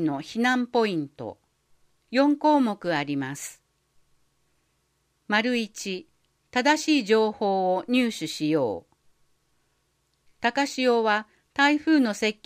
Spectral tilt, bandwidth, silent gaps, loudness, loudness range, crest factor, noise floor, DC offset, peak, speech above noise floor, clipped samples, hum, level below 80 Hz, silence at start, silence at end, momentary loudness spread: -4 dB/octave; 15.5 kHz; none; -24 LUFS; 5 LU; 18 dB; -71 dBFS; under 0.1%; -8 dBFS; 47 dB; under 0.1%; none; -72 dBFS; 0 s; 0.15 s; 12 LU